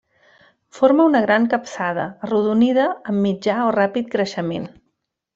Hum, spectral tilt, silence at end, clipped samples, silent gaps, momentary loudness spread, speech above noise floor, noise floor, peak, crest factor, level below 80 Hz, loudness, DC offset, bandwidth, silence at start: none; -6.5 dB/octave; 0.7 s; under 0.1%; none; 10 LU; 55 dB; -73 dBFS; -2 dBFS; 18 dB; -62 dBFS; -19 LUFS; under 0.1%; 7.8 kHz; 0.75 s